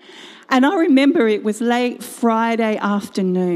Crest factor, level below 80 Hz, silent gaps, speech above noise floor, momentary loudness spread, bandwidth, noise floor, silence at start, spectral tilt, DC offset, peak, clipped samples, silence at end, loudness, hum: 14 dB; -70 dBFS; none; 24 dB; 7 LU; 14.5 kHz; -41 dBFS; 0.15 s; -5.5 dB/octave; under 0.1%; -2 dBFS; under 0.1%; 0 s; -17 LUFS; none